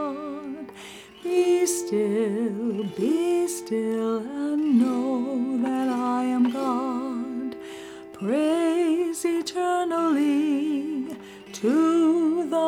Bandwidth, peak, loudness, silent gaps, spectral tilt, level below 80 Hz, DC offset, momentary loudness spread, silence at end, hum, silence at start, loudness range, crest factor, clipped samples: 16.5 kHz; -10 dBFS; -24 LUFS; none; -5 dB/octave; -70 dBFS; under 0.1%; 14 LU; 0 s; none; 0 s; 2 LU; 14 dB; under 0.1%